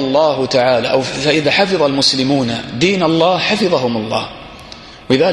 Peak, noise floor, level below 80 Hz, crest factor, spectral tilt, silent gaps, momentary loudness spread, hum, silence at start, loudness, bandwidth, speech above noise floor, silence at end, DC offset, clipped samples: 0 dBFS; -35 dBFS; -48 dBFS; 14 dB; -4.5 dB/octave; none; 16 LU; none; 0 s; -14 LUFS; 12 kHz; 21 dB; 0 s; under 0.1%; under 0.1%